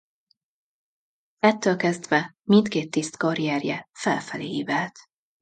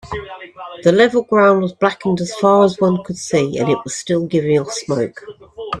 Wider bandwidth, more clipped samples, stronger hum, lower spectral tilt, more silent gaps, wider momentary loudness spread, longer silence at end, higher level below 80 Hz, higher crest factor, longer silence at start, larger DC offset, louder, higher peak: second, 9.2 kHz vs 11.5 kHz; neither; neither; about the same, -5 dB/octave vs -5.5 dB/octave; neither; second, 9 LU vs 18 LU; first, 0.4 s vs 0 s; second, -70 dBFS vs -52 dBFS; first, 22 dB vs 16 dB; first, 1.45 s vs 0.05 s; neither; second, -24 LUFS vs -16 LUFS; second, -4 dBFS vs 0 dBFS